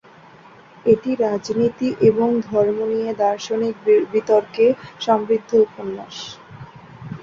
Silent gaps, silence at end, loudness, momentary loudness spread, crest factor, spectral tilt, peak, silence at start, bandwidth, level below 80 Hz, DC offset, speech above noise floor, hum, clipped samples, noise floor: none; 0 s; -19 LUFS; 16 LU; 16 dB; -6 dB/octave; -4 dBFS; 0.85 s; 7.2 kHz; -58 dBFS; under 0.1%; 27 dB; none; under 0.1%; -46 dBFS